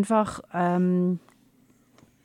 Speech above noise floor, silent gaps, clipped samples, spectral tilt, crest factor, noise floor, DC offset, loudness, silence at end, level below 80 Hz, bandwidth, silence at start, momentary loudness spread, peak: 37 dB; none; under 0.1%; -7.5 dB/octave; 16 dB; -61 dBFS; under 0.1%; -25 LUFS; 1.05 s; -62 dBFS; 11.5 kHz; 0 s; 7 LU; -10 dBFS